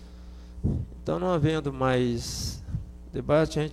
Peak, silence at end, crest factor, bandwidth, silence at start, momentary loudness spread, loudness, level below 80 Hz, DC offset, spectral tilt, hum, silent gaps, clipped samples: -12 dBFS; 0 s; 16 dB; 15 kHz; 0 s; 13 LU; -28 LUFS; -42 dBFS; under 0.1%; -6 dB/octave; none; none; under 0.1%